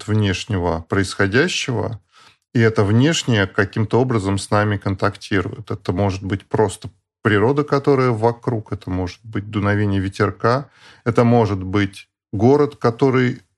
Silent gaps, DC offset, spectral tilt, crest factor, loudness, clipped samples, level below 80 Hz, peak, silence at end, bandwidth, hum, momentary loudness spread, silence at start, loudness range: none; under 0.1%; -6 dB/octave; 18 dB; -19 LUFS; under 0.1%; -48 dBFS; 0 dBFS; 0.2 s; 11.5 kHz; none; 10 LU; 0 s; 2 LU